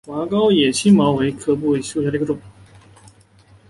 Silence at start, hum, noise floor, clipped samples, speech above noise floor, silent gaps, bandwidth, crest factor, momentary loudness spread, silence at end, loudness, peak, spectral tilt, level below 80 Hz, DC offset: 0.05 s; none; -50 dBFS; under 0.1%; 33 dB; none; 11.5 kHz; 16 dB; 9 LU; 1.2 s; -18 LUFS; -4 dBFS; -5.5 dB/octave; -52 dBFS; under 0.1%